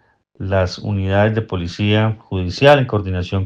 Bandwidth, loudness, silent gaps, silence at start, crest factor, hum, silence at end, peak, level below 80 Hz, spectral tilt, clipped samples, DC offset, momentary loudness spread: 7.8 kHz; -17 LUFS; none; 0.4 s; 16 dB; none; 0 s; 0 dBFS; -48 dBFS; -7 dB/octave; under 0.1%; under 0.1%; 11 LU